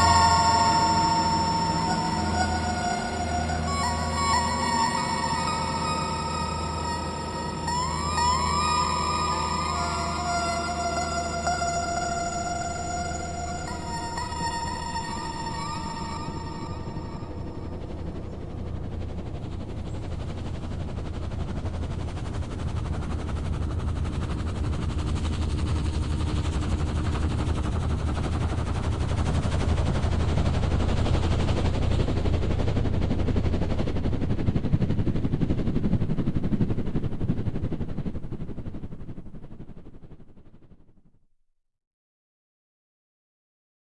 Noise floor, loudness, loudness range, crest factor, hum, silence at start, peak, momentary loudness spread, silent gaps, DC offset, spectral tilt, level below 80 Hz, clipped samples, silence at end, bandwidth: -67 dBFS; -27 LUFS; 9 LU; 18 dB; none; 0 s; -8 dBFS; 11 LU; none; under 0.1%; -5 dB/octave; -36 dBFS; under 0.1%; 3.2 s; 11.5 kHz